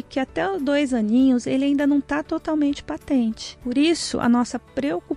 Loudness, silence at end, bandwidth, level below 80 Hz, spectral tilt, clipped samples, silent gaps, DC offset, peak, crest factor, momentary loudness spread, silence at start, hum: -22 LUFS; 0 s; 11.5 kHz; -50 dBFS; -4.5 dB/octave; under 0.1%; none; under 0.1%; -8 dBFS; 14 dB; 8 LU; 0.1 s; none